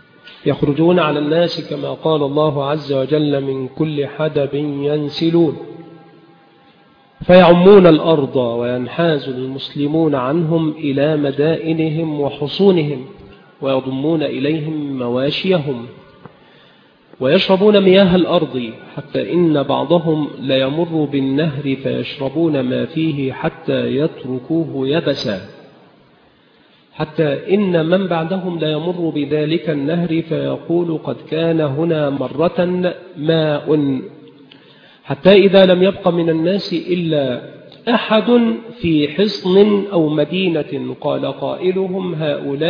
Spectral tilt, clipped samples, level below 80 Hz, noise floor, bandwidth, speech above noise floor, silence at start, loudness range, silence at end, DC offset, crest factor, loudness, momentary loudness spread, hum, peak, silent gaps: -8.5 dB/octave; under 0.1%; -52 dBFS; -51 dBFS; 5.4 kHz; 36 dB; 0.25 s; 7 LU; 0 s; under 0.1%; 16 dB; -16 LUFS; 11 LU; none; 0 dBFS; none